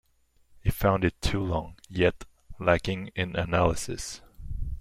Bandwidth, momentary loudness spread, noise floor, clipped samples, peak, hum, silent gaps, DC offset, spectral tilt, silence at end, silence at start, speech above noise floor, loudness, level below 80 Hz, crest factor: 16.5 kHz; 13 LU; -64 dBFS; under 0.1%; -8 dBFS; none; none; under 0.1%; -5.5 dB/octave; 0 s; 0.65 s; 37 dB; -28 LUFS; -40 dBFS; 20 dB